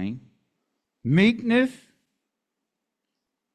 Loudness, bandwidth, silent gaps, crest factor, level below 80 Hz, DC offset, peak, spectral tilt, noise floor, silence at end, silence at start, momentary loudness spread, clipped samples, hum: -22 LUFS; 10 kHz; none; 18 dB; -62 dBFS; under 0.1%; -8 dBFS; -7.5 dB/octave; -83 dBFS; 1.8 s; 0 s; 15 LU; under 0.1%; none